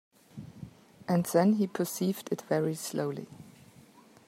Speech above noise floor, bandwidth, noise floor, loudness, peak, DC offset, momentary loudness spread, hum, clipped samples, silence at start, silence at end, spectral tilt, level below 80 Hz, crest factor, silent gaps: 28 dB; 16 kHz; -57 dBFS; -30 LUFS; -12 dBFS; under 0.1%; 24 LU; none; under 0.1%; 0.35 s; 0.75 s; -6 dB/octave; -72 dBFS; 20 dB; none